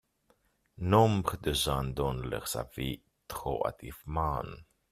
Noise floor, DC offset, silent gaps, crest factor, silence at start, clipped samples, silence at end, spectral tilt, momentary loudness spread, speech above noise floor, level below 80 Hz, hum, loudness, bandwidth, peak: -71 dBFS; under 0.1%; none; 22 dB; 0.8 s; under 0.1%; 0.3 s; -5.5 dB/octave; 18 LU; 40 dB; -46 dBFS; none; -31 LUFS; 15.5 kHz; -10 dBFS